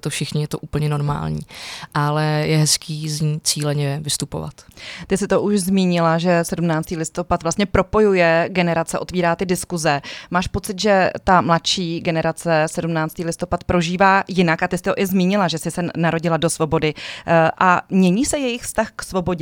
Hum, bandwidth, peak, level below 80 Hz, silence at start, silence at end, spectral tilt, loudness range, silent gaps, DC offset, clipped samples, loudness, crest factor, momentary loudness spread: none; 17.5 kHz; -2 dBFS; -42 dBFS; 0.05 s; 0 s; -5 dB/octave; 2 LU; none; under 0.1%; under 0.1%; -19 LUFS; 18 dB; 9 LU